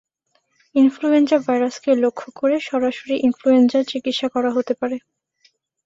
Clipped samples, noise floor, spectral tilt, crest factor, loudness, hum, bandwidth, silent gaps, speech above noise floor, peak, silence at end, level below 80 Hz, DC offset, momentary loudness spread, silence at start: under 0.1%; -67 dBFS; -4.5 dB/octave; 16 dB; -19 LUFS; none; 7.8 kHz; none; 49 dB; -4 dBFS; 0.85 s; -66 dBFS; under 0.1%; 8 LU; 0.75 s